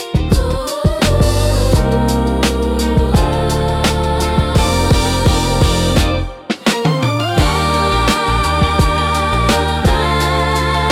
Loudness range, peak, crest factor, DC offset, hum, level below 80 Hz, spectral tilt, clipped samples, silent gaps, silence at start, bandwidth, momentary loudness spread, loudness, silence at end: 1 LU; -2 dBFS; 12 dB; under 0.1%; none; -20 dBFS; -5 dB/octave; under 0.1%; none; 0 s; 16.5 kHz; 3 LU; -14 LUFS; 0 s